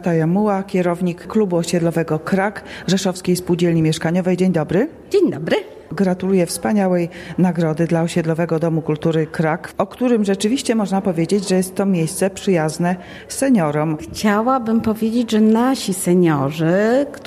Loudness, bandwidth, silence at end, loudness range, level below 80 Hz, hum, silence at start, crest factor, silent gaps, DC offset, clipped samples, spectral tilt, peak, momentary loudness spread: -18 LUFS; 15 kHz; 0 s; 2 LU; -50 dBFS; none; 0 s; 14 dB; none; under 0.1%; under 0.1%; -6 dB/octave; -4 dBFS; 5 LU